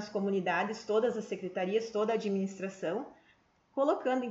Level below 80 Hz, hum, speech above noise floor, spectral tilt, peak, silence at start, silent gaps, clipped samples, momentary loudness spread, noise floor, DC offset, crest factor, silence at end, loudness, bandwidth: -78 dBFS; none; 35 dB; -6 dB/octave; -16 dBFS; 0 s; none; under 0.1%; 7 LU; -68 dBFS; under 0.1%; 16 dB; 0 s; -33 LUFS; 8 kHz